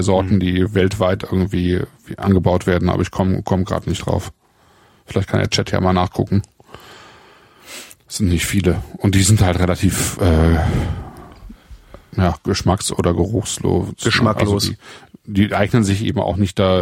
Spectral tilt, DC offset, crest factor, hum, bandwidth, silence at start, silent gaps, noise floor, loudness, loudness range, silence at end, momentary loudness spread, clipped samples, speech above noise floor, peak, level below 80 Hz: -5.5 dB/octave; under 0.1%; 16 dB; none; 16.5 kHz; 0 s; none; -53 dBFS; -18 LUFS; 4 LU; 0 s; 9 LU; under 0.1%; 36 dB; -2 dBFS; -32 dBFS